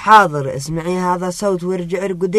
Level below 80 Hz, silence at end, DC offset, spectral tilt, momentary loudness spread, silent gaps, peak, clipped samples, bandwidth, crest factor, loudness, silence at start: -48 dBFS; 0 s; under 0.1%; -5.5 dB/octave; 12 LU; none; 0 dBFS; under 0.1%; 13.5 kHz; 16 dB; -17 LUFS; 0 s